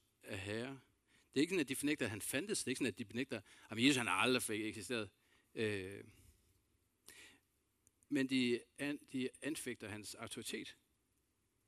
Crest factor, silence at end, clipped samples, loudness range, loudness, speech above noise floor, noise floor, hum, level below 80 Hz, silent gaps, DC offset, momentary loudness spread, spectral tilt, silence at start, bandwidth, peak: 26 dB; 0.95 s; under 0.1%; 9 LU; -40 LUFS; 41 dB; -81 dBFS; none; -78 dBFS; none; under 0.1%; 16 LU; -3.5 dB/octave; 0.25 s; 15.5 kHz; -16 dBFS